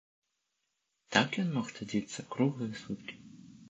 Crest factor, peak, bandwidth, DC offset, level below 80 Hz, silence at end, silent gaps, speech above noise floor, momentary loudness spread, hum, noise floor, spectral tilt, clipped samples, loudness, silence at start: 30 dB; -6 dBFS; 8.8 kHz; under 0.1%; -72 dBFS; 0 s; none; 49 dB; 16 LU; none; -83 dBFS; -5 dB/octave; under 0.1%; -34 LUFS; 1.1 s